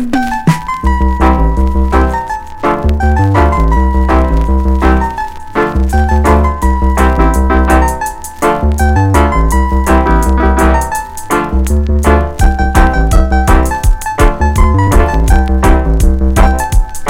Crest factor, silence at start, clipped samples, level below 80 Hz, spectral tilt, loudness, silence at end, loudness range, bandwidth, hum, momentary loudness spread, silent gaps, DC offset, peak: 10 dB; 0 s; 0.6%; -12 dBFS; -6.5 dB/octave; -11 LUFS; 0 s; 1 LU; 16 kHz; none; 5 LU; none; under 0.1%; 0 dBFS